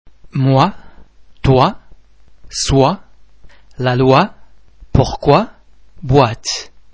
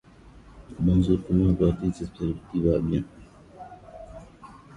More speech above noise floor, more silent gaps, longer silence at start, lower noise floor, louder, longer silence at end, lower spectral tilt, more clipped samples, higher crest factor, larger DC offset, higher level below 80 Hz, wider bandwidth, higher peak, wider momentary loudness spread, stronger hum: first, 32 dB vs 26 dB; neither; about the same, 0.35 s vs 0.35 s; second, -44 dBFS vs -50 dBFS; first, -15 LUFS vs -25 LUFS; first, 0.3 s vs 0 s; second, -6 dB/octave vs -9.5 dB/octave; first, 0.1% vs under 0.1%; about the same, 16 dB vs 18 dB; first, 0.9% vs under 0.1%; first, -32 dBFS vs -38 dBFS; second, 8 kHz vs 10 kHz; first, 0 dBFS vs -8 dBFS; second, 12 LU vs 23 LU; neither